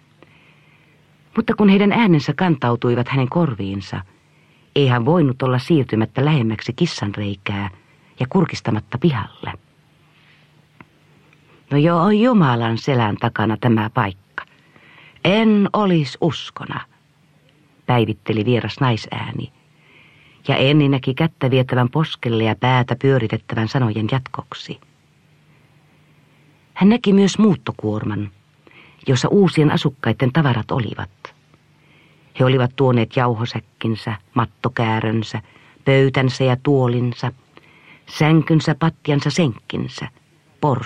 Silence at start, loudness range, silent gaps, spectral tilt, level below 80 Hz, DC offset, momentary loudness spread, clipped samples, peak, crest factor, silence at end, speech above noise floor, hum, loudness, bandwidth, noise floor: 1.35 s; 5 LU; none; -7 dB/octave; -54 dBFS; under 0.1%; 15 LU; under 0.1%; -2 dBFS; 18 dB; 0 s; 38 dB; none; -18 LUFS; 9.2 kHz; -55 dBFS